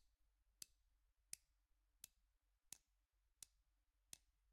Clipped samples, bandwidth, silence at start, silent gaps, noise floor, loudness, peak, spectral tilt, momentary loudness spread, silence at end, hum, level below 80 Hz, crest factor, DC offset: under 0.1%; 15 kHz; 0 s; none; -86 dBFS; -63 LUFS; -32 dBFS; 1 dB/octave; 6 LU; 0 s; none; -84 dBFS; 38 dB; under 0.1%